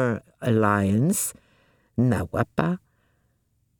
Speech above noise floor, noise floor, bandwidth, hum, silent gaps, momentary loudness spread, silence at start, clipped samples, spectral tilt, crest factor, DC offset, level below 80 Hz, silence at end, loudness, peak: 46 dB; -69 dBFS; 19 kHz; none; none; 8 LU; 0 s; under 0.1%; -6 dB/octave; 20 dB; under 0.1%; -54 dBFS; 1 s; -24 LUFS; -4 dBFS